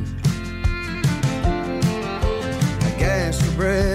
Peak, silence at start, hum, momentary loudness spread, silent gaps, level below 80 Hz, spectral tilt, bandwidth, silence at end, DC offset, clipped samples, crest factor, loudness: -8 dBFS; 0 s; none; 4 LU; none; -28 dBFS; -6 dB/octave; 16 kHz; 0 s; under 0.1%; under 0.1%; 12 dB; -22 LUFS